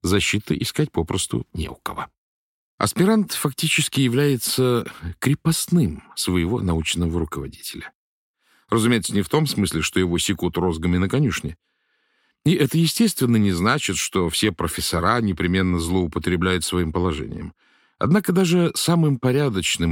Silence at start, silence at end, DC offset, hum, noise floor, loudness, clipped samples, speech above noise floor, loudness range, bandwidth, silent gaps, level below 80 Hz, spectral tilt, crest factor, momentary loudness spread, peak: 0.05 s; 0 s; under 0.1%; none; -68 dBFS; -21 LUFS; under 0.1%; 48 dB; 3 LU; 17 kHz; 2.18-2.78 s, 7.95-8.34 s; -42 dBFS; -5 dB/octave; 16 dB; 11 LU; -4 dBFS